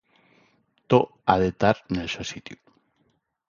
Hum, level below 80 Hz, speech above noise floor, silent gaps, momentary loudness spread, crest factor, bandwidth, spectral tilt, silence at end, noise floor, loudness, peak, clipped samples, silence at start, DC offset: none; -50 dBFS; 46 dB; none; 15 LU; 22 dB; 7.4 kHz; -6 dB/octave; 0.95 s; -70 dBFS; -24 LUFS; -4 dBFS; under 0.1%; 0.9 s; under 0.1%